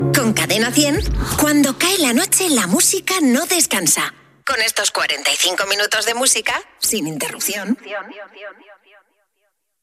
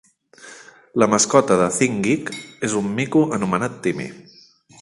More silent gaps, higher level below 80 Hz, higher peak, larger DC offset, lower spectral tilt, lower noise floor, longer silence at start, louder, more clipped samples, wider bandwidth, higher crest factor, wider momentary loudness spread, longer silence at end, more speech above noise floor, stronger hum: neither; first, -36 dBFS vs -58 dBFS; about the same, -2 dBFS vs 0 dBFS; neither; second, -2.5 dB/octave vs -4.5 dB/octave; first, -69 dBFS vs -50 dBFS; second, 0 s vs 0.45 s; first, -16 LUFS vs -19 LUFS; neither; first, 15.5 kHz vs 11.5 kHz; about the same, 16 dB vs 20 dB; second, 10 LU vs 15 LU; first, 1.1 s vs 0.6 s; first, 52 dB vs 30 dB; neither